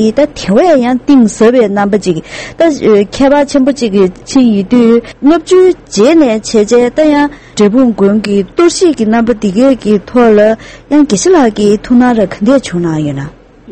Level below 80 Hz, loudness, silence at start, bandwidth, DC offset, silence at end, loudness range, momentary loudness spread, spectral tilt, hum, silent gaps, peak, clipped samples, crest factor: -38 dBFS; -9 LUFS; 0 s; 8.8 kHz; 0.4%; 0 s; 1 LU; 5 LU; -5.5 dB/octave; none; none; 0 dBFS; 0.9%; 8 dB